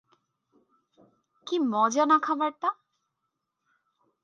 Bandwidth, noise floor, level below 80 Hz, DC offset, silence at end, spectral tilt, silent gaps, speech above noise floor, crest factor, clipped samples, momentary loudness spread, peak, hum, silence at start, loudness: 8.8 kHz; -82 dBFS; -88 dBFS; under 0.1%; 1.5 s; -3.5 dB/octave; none; 57 dB; 20 dB; under 0.1%; 15 LU; -10 dBFS; none; 1.45 s; -26 LUFS